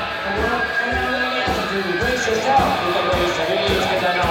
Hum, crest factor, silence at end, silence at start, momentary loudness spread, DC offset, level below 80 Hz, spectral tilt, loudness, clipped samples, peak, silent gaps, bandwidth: none; 14 dB; 0 s; 0 s; 4 LU; under 0.1%; -36 dBFS; -4 dB/octave; -19 LUFS; under 0.1%; -6 dBFS; none; 17 kHz